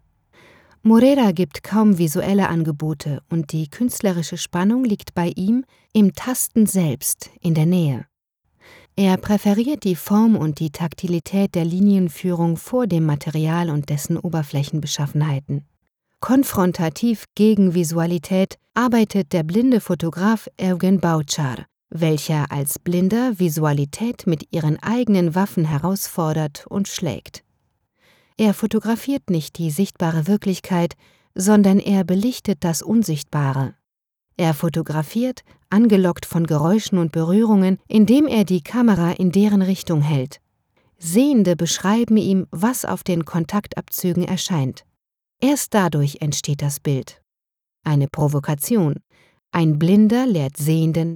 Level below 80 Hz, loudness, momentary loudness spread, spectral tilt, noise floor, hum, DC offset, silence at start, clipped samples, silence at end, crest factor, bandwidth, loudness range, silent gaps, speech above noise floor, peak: -54 dBFS; -19 LUFS; 8 LU; -6 dB/octave; -87 dBFS; none; under 0.1%; 0.85 s; under 0.1%; 0 s; 16 dB; 19.5 kHz; 4 LU; none; 68 dB; -4 dBFS